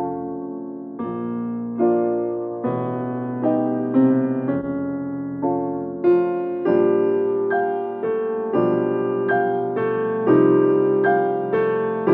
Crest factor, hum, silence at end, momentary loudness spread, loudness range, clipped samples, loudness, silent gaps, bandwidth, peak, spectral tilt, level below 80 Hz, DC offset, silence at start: 16 dB; none; 0 s; 10 LU; 4 LU; under 0.1%; -21 LUFS; none; 3.8 kHz; -6 dBFS; -11 dB/octave; -64 dBFS; under 0.1%; 0 s